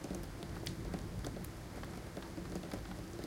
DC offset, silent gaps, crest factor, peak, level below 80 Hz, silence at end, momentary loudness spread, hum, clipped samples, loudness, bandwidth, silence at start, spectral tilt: under 0.1%; none; 18 dB; -26 dBFS; -52 dBFS; 0 s; 4 LU; none; under 0.1%; -45 LUFS; 17 kHz; 0 s; -5.5 dB/octave